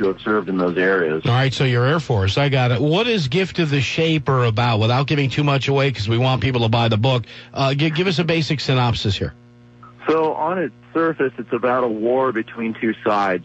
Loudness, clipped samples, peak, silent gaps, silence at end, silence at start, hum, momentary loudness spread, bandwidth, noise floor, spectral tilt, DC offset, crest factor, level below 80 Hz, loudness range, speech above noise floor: -19 LUFS; under 0.1%; -6 dBFS; none; 0 s; 0 s; none; 5 LU; 8.2 kHz; -45 dBFS; -6.5 dB/octave; under 0.1%; 12 dB; -48 dBFS; 3 LU; 26 dB